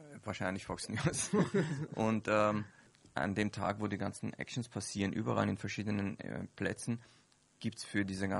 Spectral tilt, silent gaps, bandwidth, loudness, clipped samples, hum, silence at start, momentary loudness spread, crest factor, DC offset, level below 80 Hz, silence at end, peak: -5.5 dB/octave; none; 11.5 kHz; -37 LUFS; under 0.1%; none; 0 s; 11 LU; 20 dB; under 0.1%; -66 dBFS; 0 s; -16 dBFS